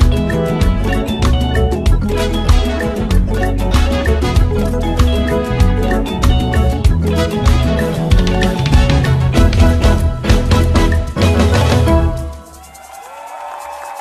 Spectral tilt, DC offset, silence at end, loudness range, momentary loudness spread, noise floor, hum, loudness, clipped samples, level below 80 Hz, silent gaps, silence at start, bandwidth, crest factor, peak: -6.5 dB/octave; under 0.1%; 0 s; 3 LU; 11 LU; -36 dBFS; none; -14 LUFS; under 0.1%; -16 dBFS; none; 0 s; 14 kHz; 12 dB; 0 dBFS